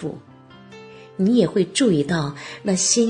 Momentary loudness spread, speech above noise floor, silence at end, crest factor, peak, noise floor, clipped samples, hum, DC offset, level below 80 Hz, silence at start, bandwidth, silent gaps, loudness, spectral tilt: 22 LU; 24 dB; 0 s; 18 dB; -2 dBFS; -44 dBFS; under 0.1%; none; under 0.1%; -56 dBFS; 0 s; 10 kHz; none; -20 LUFS; -4 dB/octave